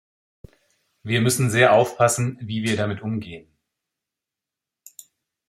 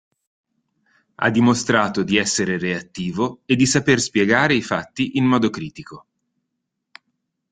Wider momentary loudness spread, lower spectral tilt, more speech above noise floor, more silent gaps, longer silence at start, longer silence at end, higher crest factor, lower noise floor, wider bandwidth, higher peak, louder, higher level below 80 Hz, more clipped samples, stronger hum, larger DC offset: first, 18 LU vs 9 LU; about the same, -4.5 dB/octave vs -4.5 dB/octave; first, 67 dB vs 59 dB; neither; second, 1.05 s vs 1.2 s; first, 2.1 s vs 1.5 s; about the same, 22 dB vs 20 dB; first, -87 dBFS vs -78 dBFS; first, 16 kHz vs 9.6 kHz; about the same, -2 dBFS vs -2 dBFS; about the same, -21 LUFS vs -19 LUFS; about the same, -60 dBFS vs -56 dBFS; neither; neither; neither